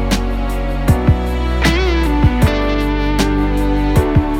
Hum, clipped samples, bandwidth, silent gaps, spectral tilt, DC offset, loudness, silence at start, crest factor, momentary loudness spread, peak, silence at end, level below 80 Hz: none; under 0.1%; 16.5 kHz; none; -6.5 dB/octave; under 0.1%; -16 LUFS; 0 s; 14 dB; 5 LU; 0 dBFS; 0 s; -18 dBFS